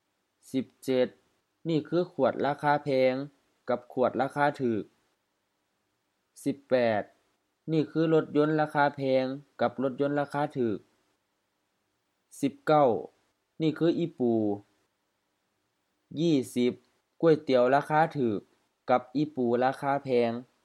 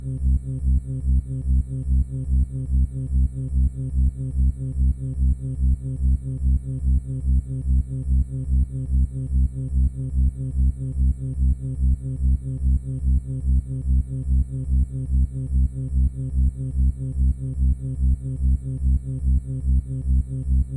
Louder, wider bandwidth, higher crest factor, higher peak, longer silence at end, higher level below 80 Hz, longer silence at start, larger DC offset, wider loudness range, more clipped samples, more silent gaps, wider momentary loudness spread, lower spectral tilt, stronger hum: second, -28 LUFS vs -24 LUFS; first, 13.5 kHz vs 8.8 kHz; first, 20 dB vs 10 dB; about the same, -10 dBFS vs -12 dBFS; first, 0.2 s vs 0 s; second, -78 dBFS vs -22 dBFS; first, 0.55 s vs 0 s; neither; first, 5 LU vs 0 LU; neither; neither; first, 11 LU vs 0 LU; second, -7 dB/octave vs -11 dB/octave; neither